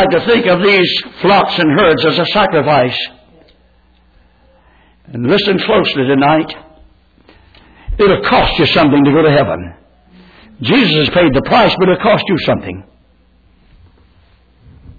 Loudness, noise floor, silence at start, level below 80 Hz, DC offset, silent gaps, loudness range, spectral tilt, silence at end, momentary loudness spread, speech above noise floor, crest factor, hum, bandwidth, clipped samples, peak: -11 LUFS; -50 dBFS; 0 s; -36 dBFS; under 0.1%; none; 5 LU; -7.5 dB/octave; 2.15 s; 13 LU; 39 dB; 12 dB; none; 5 kHz; under 0.1%; 0 dBFS